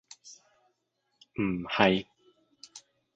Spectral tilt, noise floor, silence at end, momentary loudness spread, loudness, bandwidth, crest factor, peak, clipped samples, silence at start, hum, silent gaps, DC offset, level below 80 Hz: -5.5 dB/octave; -78 dBFS; 0.35 s; 26 LU; -28 LUFS; 8 kHz; 26 dB; -8 dBFS; under 0.1%; 0.25 s; none; none; under 0.1%; -62 dBFS